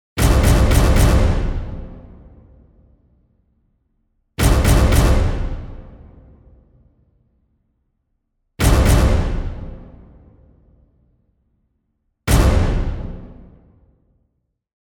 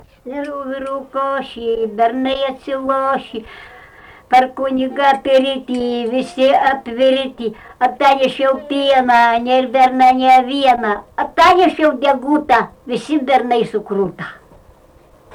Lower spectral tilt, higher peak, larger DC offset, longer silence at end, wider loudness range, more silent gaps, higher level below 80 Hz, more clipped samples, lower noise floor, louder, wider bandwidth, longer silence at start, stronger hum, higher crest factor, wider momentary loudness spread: about the same, -5.5 dB/octave vs -4.5 dB/octave; about the same, -2 dBFS vs -4 dBFS; neither; first, 1.5 s vs 0 s; about the same, 8 LU vs 7 LU; neither; first, -22 dBFS vs -50 dBFS; neither; first, -70 dBFS vs -47 dBFS; about the same, -17 LUFS vs -15 LUFS; first, 19 kHz vs 13 kHz; about the same, 0.15 s vs 0.25 s; neither; first, 18 dB vs 12 dB; first, 21 LU vs 13 LU